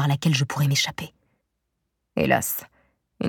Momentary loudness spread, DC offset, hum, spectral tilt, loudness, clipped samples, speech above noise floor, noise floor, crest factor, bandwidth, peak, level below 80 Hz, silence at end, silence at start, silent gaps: 12 LU; under 0.1%; none; -4.5 dB/octave; -23 LUFS; under 0.1%; 55 dB; -78 dBFS; 20 dB; 19 kHz; -4 dBFS; -56 dBFS; 0 s; 0 s; none